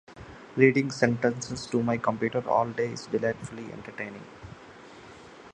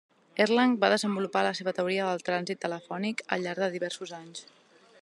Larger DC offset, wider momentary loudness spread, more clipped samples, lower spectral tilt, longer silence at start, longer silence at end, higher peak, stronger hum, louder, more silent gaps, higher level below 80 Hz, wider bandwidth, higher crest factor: neither; first, 25 LU vs 15 LU; neither; first, -6 dB/octave vs -4.5 dB/octave; second, 0.1 s vs 0.35 s; second, 0 s vs 0.6 s; first, -4 dBFS vs -8 dBFS; neither; about the same, -27 LUFS vs -29 LUFS; neither; first, -60 dBFS vs -80 dBFS; second, 10 kHz vs 12 kHz; about the same, 24 dB vs 22 dB